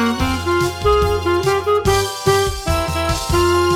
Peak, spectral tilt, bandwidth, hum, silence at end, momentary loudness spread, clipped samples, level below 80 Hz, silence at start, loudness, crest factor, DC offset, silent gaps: -2 dBFS; -5 dB/octave; 17 kHz; none; 0 s; 4 LU; under 0.1%; -28 dBFS; 0 s; -17 LUFS; 14 dB; under 0.1%; none